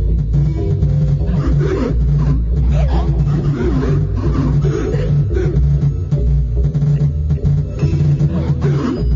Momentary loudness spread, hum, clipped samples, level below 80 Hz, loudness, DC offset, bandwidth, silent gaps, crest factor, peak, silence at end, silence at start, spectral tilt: 2 LU; none; under 0.1%; -18 dBFS; -16 LUFS; 0.3%; 7 kHz; none; 10 dB; -4 dBFS; 0 s; 0 s; -9.5 dB/octave